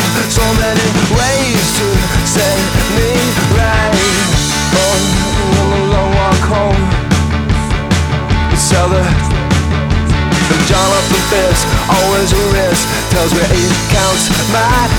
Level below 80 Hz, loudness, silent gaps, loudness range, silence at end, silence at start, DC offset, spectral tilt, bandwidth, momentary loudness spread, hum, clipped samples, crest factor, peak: -20 dBFS; -11 LUFS; none; 1 LU; 0 s; 0 s; under 0.1%; -4 dB/octave; over 20 kHz; 3 LU; none; under 0.1%; 12 dB; 0 dBFS